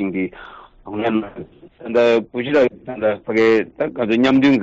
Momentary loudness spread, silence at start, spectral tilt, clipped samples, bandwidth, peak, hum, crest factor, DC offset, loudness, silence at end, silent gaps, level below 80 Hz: 16 LU; 0 s; -4.5 dB/octave; under 0.1%; 7.8 kHz; -6 dBFS; none; 12 dB; under 0.1%; -18 LUFS; 0 s; none; -54 dBFS